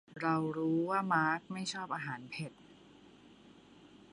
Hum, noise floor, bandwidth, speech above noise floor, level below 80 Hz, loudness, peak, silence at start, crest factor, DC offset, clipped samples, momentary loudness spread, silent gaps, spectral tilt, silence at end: none; -59 dBFS; 11.5 kHz; 25 dB; -78 dBFS; -35 LUFS; -18 dBFS; 0.1 s; 20 dB; under 0.1%; under 0.1%; 12 LU; none; -5.5 dB/octave; 0.15 s